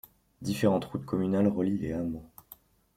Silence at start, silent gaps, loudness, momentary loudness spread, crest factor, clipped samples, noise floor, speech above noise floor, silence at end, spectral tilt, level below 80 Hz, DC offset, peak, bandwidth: 0.4 s; none; -30 LUFS; 15 LU; 18 dB; under 0.1%; -56 dBFS; 28 dB; 0.7 s; -7.5 dB/octave; -58 dBFS; under 0.1%; -12 dBFS; 16 kHz